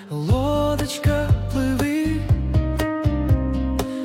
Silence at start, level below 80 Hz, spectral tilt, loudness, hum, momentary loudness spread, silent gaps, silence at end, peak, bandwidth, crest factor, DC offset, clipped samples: 0 s; -28 dBFS; -7 dB/octave; -22 LUFS; none; 3 LU; none; 0 s; -8 dBFS; 16.5 kHz; 12 dB; under 0.1%; under 0.1%